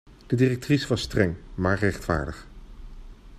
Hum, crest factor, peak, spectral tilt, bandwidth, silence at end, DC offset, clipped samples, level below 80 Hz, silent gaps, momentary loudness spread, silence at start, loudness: none; 20 dB; -6 dBFS; -6.5 dB/octave; 15 kHz; 0 s; under 0.1%; under 0.1%; -42 dBFS; none; 6 LU; 0.05 s; -25 LUFS